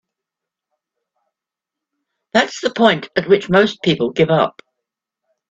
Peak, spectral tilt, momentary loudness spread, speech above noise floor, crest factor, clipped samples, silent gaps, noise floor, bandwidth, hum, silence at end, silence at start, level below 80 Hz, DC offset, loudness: 0 dBFS; -5.5 dB/octave; 6 LU; 70 dB; 20 dB; under 0.1%; none; -85 dBFS; 8 kHz; none; 1 s; 2.35 s; -56 dBFS; under 0.1%; -16 LUFS